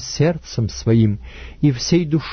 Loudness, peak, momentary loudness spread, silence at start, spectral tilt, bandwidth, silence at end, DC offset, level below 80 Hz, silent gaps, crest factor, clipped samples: -19 LUFS; -4 dBFS; 8 LU; 0 s; -6 dB/octave; 6.6 kHz; 0 s; under 0.1%; -38 dBFS; none; 14 dB; under 0.1%